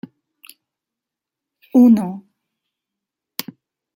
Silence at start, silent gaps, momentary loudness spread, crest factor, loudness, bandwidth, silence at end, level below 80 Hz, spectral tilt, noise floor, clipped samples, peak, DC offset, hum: 1.75 s; none; 23 LU; 18 dB; -15 LUFS; 16.5 kHz; 1.75 s; -68 dBFS; -6.5 dB/octave; -85 dBFS; under 0.1%; -2 dBFS; under 0.1%; none